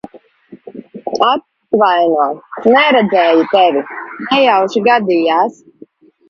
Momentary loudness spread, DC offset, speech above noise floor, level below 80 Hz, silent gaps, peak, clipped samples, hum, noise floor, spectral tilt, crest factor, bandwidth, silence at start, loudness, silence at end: 15 LU; under 0.1%; 31 dB; -64 dBFS; none; 0 dBFS; under 0.1%; none; -42 dBFS; -5.5 dB/octave; 14 dB; 7.4 kHz; 0.15 s; -12 LUFS; 0.8 s